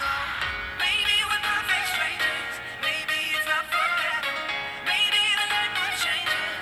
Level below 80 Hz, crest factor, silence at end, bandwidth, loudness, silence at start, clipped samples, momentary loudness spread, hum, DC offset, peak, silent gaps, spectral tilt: -54 dBFS; 16 dB; 0 s; over 20 kHz; -24 LUFS; 0 s; under 0.1%; 7 LU; none; under 0.1%; -10 dBFS; none; 0 dB/octave